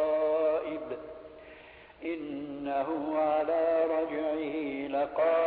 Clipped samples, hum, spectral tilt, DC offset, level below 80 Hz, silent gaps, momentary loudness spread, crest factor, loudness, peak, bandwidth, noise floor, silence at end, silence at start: under 0.1%; none; -9 dB/octave; under 0.1%; -66 dBFS; none; 19 LU; 14 dB; -31 LUFS; -16 dBFS; 4.7 kHz; -52 dBFS; 0 s; 0 s